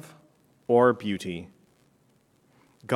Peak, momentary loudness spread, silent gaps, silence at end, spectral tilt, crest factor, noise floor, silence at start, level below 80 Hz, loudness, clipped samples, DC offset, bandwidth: -6 dBFS; 22 LU; none; 0 s; -6.5 dB/octave; 22 dB; -65 dBFS; 0.05 s; -72 dBFS; -24 LUFS; under 0.1%; under 0.1%; 13 kHz